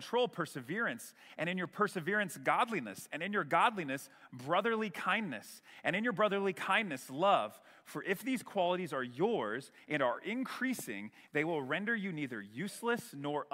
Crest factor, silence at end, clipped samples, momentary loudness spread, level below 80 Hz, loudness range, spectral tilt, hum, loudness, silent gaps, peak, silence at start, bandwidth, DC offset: 20 dB; 0.1 s; under 0.1%; 11 LU; -84 dBFS; 3 LU; -4.5 dB/octave; none; -35 LUFS; none; -14 dBFS; 0 s; 16 kHz; under 0.1%